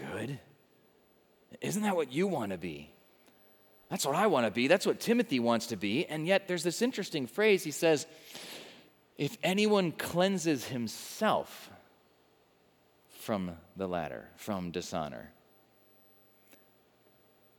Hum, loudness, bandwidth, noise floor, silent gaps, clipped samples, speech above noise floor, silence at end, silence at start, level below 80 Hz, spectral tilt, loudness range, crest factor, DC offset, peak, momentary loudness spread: none; -31 LUFS; over 20 kHz; -67 dBFS; none; under 0.1%; 36 dB; 2.3 s; 0 s; -74 dBFS; -4.5 dB/octave; 10 LU; 22 dB; under 0.1%; -12 dBFS; 17 LU